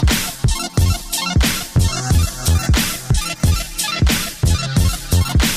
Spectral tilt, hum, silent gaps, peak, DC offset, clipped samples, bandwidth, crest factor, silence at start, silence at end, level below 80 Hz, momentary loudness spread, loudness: -4 dB/octave; none; none; -4 dBFS; under 0.1%; under 0.1%; 16 kHz; 12 dB; 0 s; 0 s; -22 dBFS; 4 LU; -17 LUFS